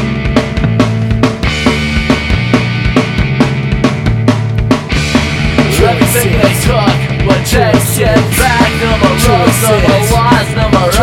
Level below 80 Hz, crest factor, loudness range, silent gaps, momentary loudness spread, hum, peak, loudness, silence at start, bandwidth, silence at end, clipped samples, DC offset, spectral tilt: -20 dBFS; 10 dB; 3 LU; none; 4 LU; none; 0 dBFS; -10 LUFS; 0 s; 18.5 kHz; 0 s; under 0.1%; under 0.1%; -5 dB/octave